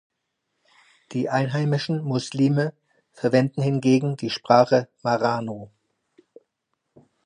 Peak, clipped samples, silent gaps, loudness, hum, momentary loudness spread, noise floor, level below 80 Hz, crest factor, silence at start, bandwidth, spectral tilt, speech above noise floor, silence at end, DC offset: -2 dBFS; under 0.1%; none; -22 LUFS; none; 10 LU; -78 dBFS; -68 dBFS; 22 dB; 1.1 s; 10 kHz; -7 dB/octave; 56 dB; 1.6 s; under 0.1%